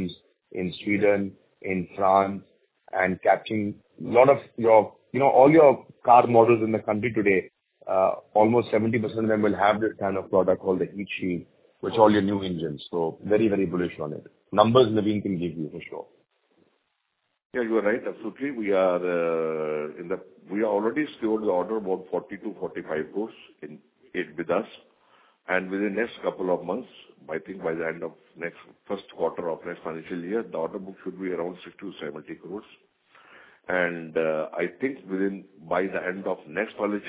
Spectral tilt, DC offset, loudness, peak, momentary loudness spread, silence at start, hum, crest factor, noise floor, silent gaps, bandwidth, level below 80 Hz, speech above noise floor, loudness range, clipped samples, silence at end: -10.5 dB/octave; under 0.1%; -25 LUFS; -2 dBFS; 17 LU; 0 s; none; 22 dB; -77 dBFS; 17.45-17.50 s; 4 kHz; -60 dBFS; 52 dB; 13 LU; under 0.1%; 0 s